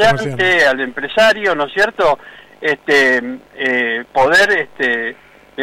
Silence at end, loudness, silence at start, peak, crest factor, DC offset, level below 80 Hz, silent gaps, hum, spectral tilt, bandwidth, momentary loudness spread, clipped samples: 0 s; -14 LUFS; 0 s; -4 dBFS; 10 dB; under 0.1%; -48 dBFS; none; none; -4 dB/octave; 16 kHz; 9 LU; under 0.1%